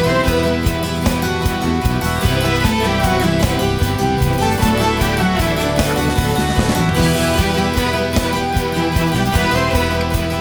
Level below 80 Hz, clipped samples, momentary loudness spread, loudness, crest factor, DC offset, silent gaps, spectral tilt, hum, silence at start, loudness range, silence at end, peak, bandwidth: -26 dBFS; under 0.1%; 3 LU; -16 LUFS; 12 dB; under 0.1%; none; -5 dB/octave; none; 0 s; 1 LU; 0 s; -4 dBFS; over 20 kHz